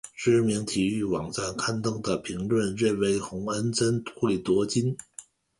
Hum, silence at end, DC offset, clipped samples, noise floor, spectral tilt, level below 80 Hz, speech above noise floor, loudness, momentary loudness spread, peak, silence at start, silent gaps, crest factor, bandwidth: none; 0.4 s; under 0.1%; under 0.1%; -50 dBFS; -5 dB/octave; -56 dBFS; 23 dB; -27 LUFS; 7 LU; -12 dBFS; 0.05 s; none; 16 dB; 11.5 kHz